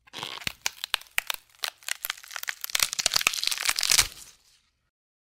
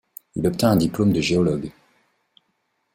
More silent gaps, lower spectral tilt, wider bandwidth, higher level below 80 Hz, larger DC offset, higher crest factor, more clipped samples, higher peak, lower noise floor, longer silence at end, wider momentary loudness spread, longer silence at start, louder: neither; second, 1.5 dB/octave vs -6 dB/octave; about the same, 16.5 kHz vs 16.5 kHz; second, -56 dBFS vs -50 dBFS; neither; first, 26 dB vs 20 dB; neither; about the same, -4 dBFS vs -4 dBFS; second, -65 dBFS vs -72 dBFS; second, 1 s vs 1.25 s; about the same, 13 LU vs 12 LU; second, 0.15 s vs 0.35 s; second, -26 LUFS vs -21 LUFS